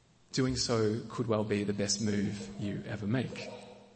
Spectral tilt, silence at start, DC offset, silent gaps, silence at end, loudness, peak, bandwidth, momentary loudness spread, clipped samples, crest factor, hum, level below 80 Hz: -5 dB/octave; 0.3 s; under 0.1%; none; 0.1 s; -33 LUFS; -16 dBFS; 8.8 kHz; 9 LU; under 0.1%; 16 dB; none; -58 dBFS